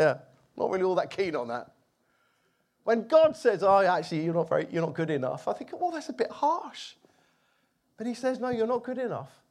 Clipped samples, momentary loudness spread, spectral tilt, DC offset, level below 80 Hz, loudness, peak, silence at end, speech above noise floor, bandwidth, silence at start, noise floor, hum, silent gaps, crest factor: under 0.1%; 15 LU; -6 dB/octave; under 0.1%; -72 dBFS; -28 LUFS; -10 dBFS; 0.25 s; 45 dB; 11 kHz; 0 s; -72 dBFS; none; none; 18 dB